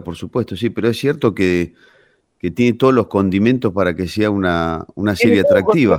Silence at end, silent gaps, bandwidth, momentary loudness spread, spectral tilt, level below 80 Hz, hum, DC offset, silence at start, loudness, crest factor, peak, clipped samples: 0 s; none; 16 kHz; 9 LU; -7 dB/octave; -46 dBFS; none; under 0.1%; 0 s; -16 LUFS; 14 dB; -2 dBFS; under 0.1%